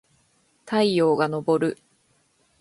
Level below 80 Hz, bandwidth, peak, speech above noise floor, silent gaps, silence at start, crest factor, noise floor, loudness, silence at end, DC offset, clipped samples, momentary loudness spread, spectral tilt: -68 dBFS; 11.5 kHz; -6 dBFS; 44 dB; none; 0.65 s; 18 dB; -65 dBFS; -22 LUFS; 0.85 s; under 0.1%; under 0.1%; 8 LU; -6.5 dB/octave